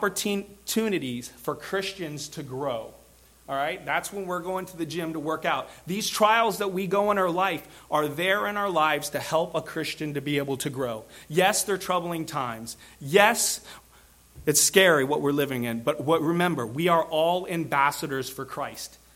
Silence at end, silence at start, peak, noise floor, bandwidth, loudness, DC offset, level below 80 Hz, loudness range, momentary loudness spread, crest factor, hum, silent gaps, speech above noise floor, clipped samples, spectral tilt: 0.2 s; 0 s; -2 dBFS; -55 dBFS; 16.5 kHz; -26 LUFS; under 0.1%; -60 dBFS; 8 LU; 13 LU; 24 dB; none; none; 29 dB; under 0.1%; -3.5 dB/octave